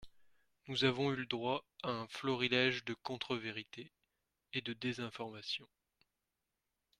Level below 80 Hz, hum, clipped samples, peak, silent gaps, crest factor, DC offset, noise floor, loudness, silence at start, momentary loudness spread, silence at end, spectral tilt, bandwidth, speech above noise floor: -74 dBFS; none; under 0.1%; -18 dBFS; none; 24 dB; under 0.1%; -89 dBFS; -38 LUFS; 0 s; 12 LU; 1.35 s; -5 dB/octave; 12 kHz; 50 dB